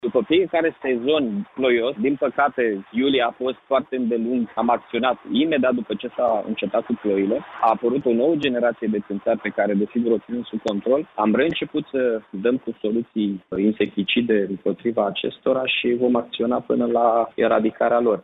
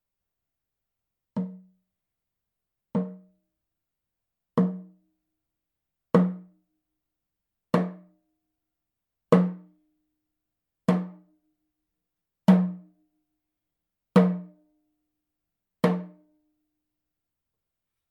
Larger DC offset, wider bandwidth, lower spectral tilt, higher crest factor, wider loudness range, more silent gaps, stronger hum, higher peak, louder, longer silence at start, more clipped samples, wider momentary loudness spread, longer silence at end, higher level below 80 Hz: neither; second, 6.8 kHz vs 9.2 kHz; second, -7.5 dB/octave vs -9 dB/octave; second, 16 dB vs 26 dB; second, 2 LU vs 11 LU; neither; neither; about the same, -6 dBFS vs -4 dBFS; first, -22 LUFS vs -26 LUFS; second, 0.05 s vs 1.35 s; neither; second, 5 LU vs 17 LU; second, 0.05 s vs 2.05 s; first, -60 dBFS vs -80 dBFS